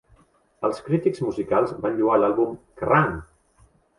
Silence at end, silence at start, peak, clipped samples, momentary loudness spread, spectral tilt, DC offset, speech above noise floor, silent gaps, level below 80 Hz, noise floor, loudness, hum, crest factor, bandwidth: 0.75 s; 0.6 s; -6 dBFS; under 0.1%; 8 LU; -8 dB/octave; under 0.1%; 37 dB; none; -52 dBFS; -59 dBFS; -23 LUFS; none; 18 dB; 11.5 kHz